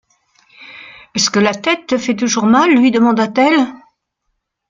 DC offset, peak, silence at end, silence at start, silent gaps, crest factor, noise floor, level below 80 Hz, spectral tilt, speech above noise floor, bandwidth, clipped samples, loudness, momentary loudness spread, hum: under 0.1%; 0 dBFS; 0.95 s; 0.6 s; none; 14 dB; -71 dBFS; -58 dBFS; -3.5 dB/octave; 58 dB; 7.6 kHz; under 0.1%; -13 LUFS; 12 LU; none